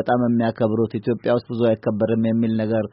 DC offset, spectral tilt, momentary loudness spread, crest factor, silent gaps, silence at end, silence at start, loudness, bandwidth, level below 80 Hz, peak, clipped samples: under 0.1%; -7.5 dB/octave; 3 LU; 14 dB; none; 0.05 s; 0 s; -21 LUFS; 5.2 kHz; -58 dBFS; -6 dBFS; under 0.1%